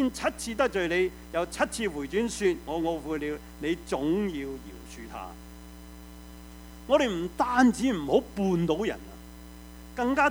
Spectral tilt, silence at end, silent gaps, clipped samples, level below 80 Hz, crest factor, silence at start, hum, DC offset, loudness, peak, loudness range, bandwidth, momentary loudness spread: -5 dB/octave; 0 s; none; under 0.1%; -48 dBFS; 22 dB; 0 s; none; under 0.1%; -28 LUFS; -8 dBFS; 7 LU; over 20 kHz; 22 LU